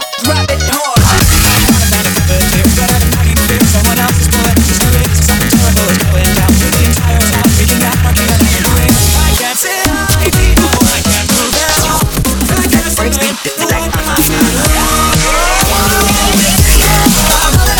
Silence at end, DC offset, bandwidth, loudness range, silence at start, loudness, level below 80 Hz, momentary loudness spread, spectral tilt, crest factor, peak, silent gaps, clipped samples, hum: 0 s; 0.3%; 20 kHz; 2 LU; 0 s; -9 LUFS; -16 dBFS; 4 LU; -3.5 dB/octave; 10 dB; 0 dBFS; none; under 0.1%; none